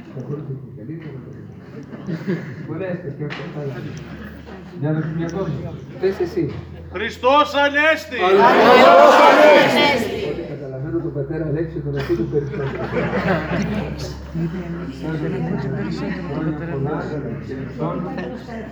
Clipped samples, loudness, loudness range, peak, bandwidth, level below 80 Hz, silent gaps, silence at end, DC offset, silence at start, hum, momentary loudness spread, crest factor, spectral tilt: under 0.1%; -18 LUFS; 17 LU; 0 dBFS; over 20 kHz; -42 dBFS; none; 0 s; under 0.1%; 0 s; none; 22 LU; 18 dB; -6 dB/octave